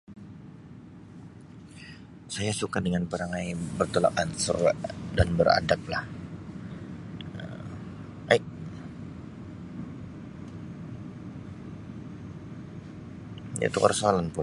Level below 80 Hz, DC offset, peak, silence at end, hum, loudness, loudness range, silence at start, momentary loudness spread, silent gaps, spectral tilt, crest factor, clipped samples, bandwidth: -48 dBFS; under 0.1%; -4 dBFS; 0 s; none; -29 LUFS; 15 LU; 0.1 s; 22 LU; none; -5 dB/octave; 26 dB; under 0.1%; 11.5 kHz